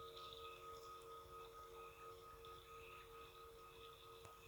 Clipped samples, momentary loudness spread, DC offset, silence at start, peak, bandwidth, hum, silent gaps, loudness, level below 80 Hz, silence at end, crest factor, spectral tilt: under 0.1%; 5 LU; under 0.1%; 0 s; -40 dBFS; over 20 kHz; none; none; -58 LUFS; -74 dBFS; 0 s; 18 dB; -3 dB/octave